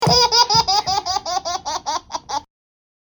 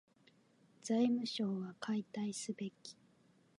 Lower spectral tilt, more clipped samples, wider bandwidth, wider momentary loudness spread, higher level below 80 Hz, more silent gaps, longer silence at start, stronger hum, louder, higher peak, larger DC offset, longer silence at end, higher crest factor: second, -2 dB/octave vs -5 dB/octave; neither; first, over 20 kHz vs 11.5 kHz; about the same, 14 LU vs 16 LU; first, -44 dBFS vs -90 dBFS; neither; second, 0 s vs 0.85 s; neither; first, -18 LUFS vs -39 LUFS; first, -2 dBFS vs -22 dBFS; neither; about the same, 0.6 s vs 0.65 s; about the same, 18 dB vs 18 dB